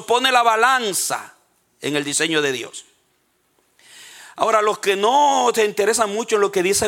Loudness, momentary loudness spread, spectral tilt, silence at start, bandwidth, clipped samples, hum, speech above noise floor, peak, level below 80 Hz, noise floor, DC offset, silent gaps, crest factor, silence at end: -18 LUFS; 13 LU; -2 dB/octave; 0 s; 17 kHz; under 0.1%; none; 46 dB; -2 dBFS; -64 dBFS; -65 dBFS; under 0.1%; none; 18 dB; 0 s